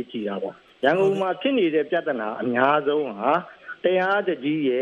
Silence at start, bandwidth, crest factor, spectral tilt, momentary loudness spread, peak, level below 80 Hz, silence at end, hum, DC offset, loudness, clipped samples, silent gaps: 0 s; 7.4 kHz; 18 dB; -7 dB/octave; 9 LU; -4 dBFS; -72 dBFS; 0 s; none; under 0.1%; -23 LUFS; under 0.1%; none